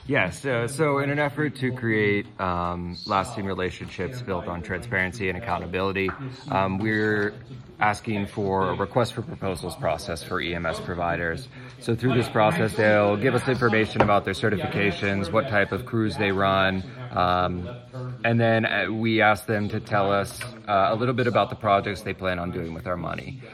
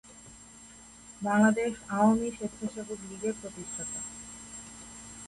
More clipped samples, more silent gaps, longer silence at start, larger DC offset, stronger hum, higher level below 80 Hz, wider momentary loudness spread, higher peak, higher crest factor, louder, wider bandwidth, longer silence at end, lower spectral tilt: neither; neither; about the same, 0 s vs 0.05 s; neither; neither; first, -54 dBFS vs -60 dBFS; second, 10 LU vs 24 LU; first, -4 dBFS vs -12 dBFS; about the same, 20 dB vs 18 dB; first, -25 LUFS vs -30 LUFS; first, 14.5 kHz vs 11.5 kHz; about the same, 0 s vs 0 s; about the same, -6 dB/octave vs -5 dB/octave